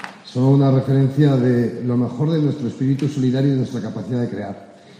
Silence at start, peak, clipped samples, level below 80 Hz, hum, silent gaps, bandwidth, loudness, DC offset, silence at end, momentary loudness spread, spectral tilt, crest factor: 0 s; -4 dBFS; under 0.1%; -58 dBFS; none; none; 8.8 kHz; -19 LUFS; under 0.1%; 0.3 s; 11 LU; -9 dB/octave; 14 dB